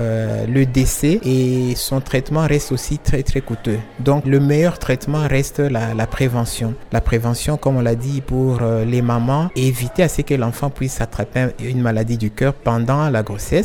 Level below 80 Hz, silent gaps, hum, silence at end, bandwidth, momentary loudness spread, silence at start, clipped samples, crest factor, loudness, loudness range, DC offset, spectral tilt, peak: -30 dBFS; none; none; 0 s; 17.5 kHz; 6 LU; 0 s; under 0.1%; 16 dB; -18 LUFS; 1 LU; under 0.1%; -6.5 dB/octave; -2 dBFS